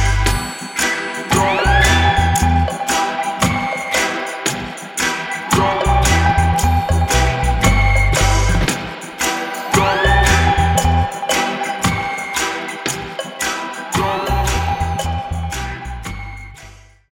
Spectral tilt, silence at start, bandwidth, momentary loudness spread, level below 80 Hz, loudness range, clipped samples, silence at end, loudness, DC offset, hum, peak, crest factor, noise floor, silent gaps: -4 dB/octave; 0 s; 17.5 kHz; 10 LU; -22 dBFS; 5 LU; under 0.1%; 0.4 s; -17 LUFS; under 0.1%; none; -2 dBFS; 16 dB; -41 dBFS; none